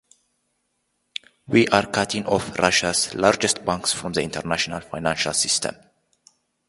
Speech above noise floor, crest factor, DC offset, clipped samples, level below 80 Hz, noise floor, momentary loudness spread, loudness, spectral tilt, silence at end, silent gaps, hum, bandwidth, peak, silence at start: 51 dB; 24 dB; under 0.1%; under 0.1%; -52 dBFS; -73 dBFS; 9 LU; -21 LUFS; -3 dB/octave; 0.95 s; none; none; 11.5 kHz; 0 dBFS; 1.5 s